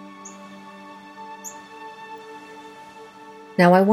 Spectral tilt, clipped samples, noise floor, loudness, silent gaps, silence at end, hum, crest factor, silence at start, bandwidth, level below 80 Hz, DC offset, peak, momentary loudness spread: -6.5 dB/octave; under 0.1%; -43 dBFS; -20 LUFS; none; 0 s; none; 22 dB; 0.25 s; 14 kHz; -76 dBFS; under 0.1%; -2 dBFS; 24 LU